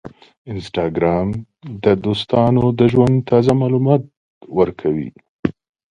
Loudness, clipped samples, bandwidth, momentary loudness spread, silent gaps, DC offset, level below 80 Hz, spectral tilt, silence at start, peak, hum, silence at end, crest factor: -17 LUFS; under 0.1%; 10.5 kHz; 11 LU; 0.37-0.45 s, 4.17-4.41 s, 5.29-5.43 s; under 0.1%; -44 dBFS; -8.5 dB/octave; 0.05 s; 0 dBFS; none; 0.4 s; 16 dB